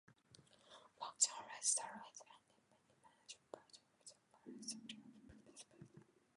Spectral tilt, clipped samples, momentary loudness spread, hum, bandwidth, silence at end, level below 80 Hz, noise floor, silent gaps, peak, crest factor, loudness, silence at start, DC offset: 0 dB/octave; under 0.1%; 26 LU; none; 11 kHz; 0.35 s; -86 dBFS; -76 dBFS; none; -20 dBFS; 30 dB; -41 LUFS; 0.1 s; under 0.1%